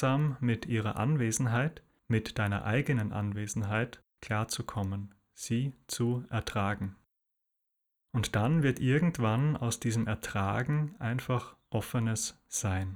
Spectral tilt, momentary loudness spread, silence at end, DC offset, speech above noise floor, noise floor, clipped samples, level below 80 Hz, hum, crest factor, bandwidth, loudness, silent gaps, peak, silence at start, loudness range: -5.5 dB/octave; 8 LU; 0 s; under 0.1%; 53 dB; -83 dBFS; under 0.1%; -56 dBFS; none; 16 dB; 17 kHz; -32 LUFS; none; -16 dBFS; 0 s; 5 LU